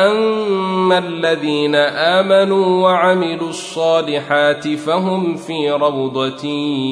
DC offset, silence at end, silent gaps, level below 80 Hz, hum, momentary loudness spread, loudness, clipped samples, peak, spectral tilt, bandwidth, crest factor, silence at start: under 0.1%; 0 s; none; -66 dBFS; none; 8 LU; -16 LUFS; under 0.1%; -2 dBFS; -5.5 dB/octave; 10.5 kHz; 14 dB; 0 s